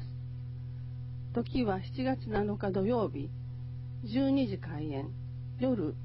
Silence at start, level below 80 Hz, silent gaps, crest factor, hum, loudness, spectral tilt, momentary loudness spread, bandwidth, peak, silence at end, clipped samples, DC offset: 0 s; -52 dBFS; none; 16 dB; none; -34 LUFS; -7.5 dB/octave; 12 LU; 5.8 kHz; -18 dBFS; 0 s; under 0.1%; under 0.1%